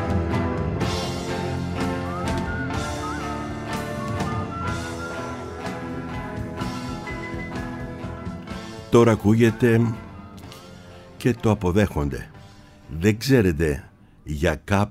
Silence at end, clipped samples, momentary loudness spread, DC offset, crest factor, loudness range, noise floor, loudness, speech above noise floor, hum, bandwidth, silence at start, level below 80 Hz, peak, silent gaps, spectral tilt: 0 s; under 0.1%; 16 LU; under 0.1%; 22 dB; 9 LU; -46 dBFS; -24 LUFS; 26 dB; none; 16 kHz; 0 s; -40 dBFS; -4 dBFS; none; -6.5 dB/octave